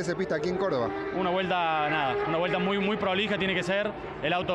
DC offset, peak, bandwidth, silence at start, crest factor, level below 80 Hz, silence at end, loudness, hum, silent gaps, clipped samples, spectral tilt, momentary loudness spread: under 0.1%; -14 dBFS; 10.5 kHz; 0 s; 14 dB; -56 dBFS; 0 s; -27 LUFS; none; none; under 0.1%; -5.5 dB/octave; 3 LU